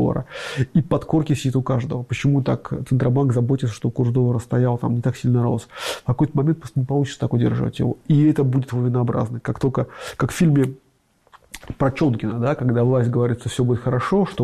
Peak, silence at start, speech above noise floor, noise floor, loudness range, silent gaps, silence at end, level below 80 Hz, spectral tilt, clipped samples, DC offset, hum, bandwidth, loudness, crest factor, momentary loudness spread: -8 dBFS; 0 s; 41 dB; -61 dBFS; 2 LU; none; 0 s; -46 dBFS; -7.5 dB/octave; under 0.1%; under 0.1%; none; 13 kHz; -21 LUFS; 12 dB; 7 LU